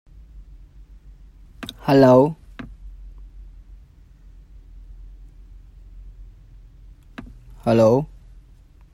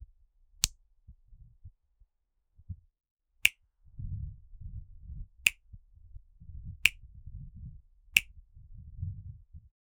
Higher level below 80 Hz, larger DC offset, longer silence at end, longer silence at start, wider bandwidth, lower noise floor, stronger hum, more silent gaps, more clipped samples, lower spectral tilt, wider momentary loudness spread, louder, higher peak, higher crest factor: first, -44 dBFS vs -50 dBFS; neither; first, 0.9 s vs 0.35 s; first, 0.35 s vs 0 s; first, 16 kHz vs 13 kHz; second, -48 dBFS vs -78 dBFS; neither; second, none vs 3.11-3.16 s; neither; first, -8 dB/octave vs -0.5 dB/octave; first, 29 LU vs 24 LU; first, -17 LUFS vs -30 LUFS; about the same, -2 dBFS vs -2 dBFS; second, 22 dB vs 36 dB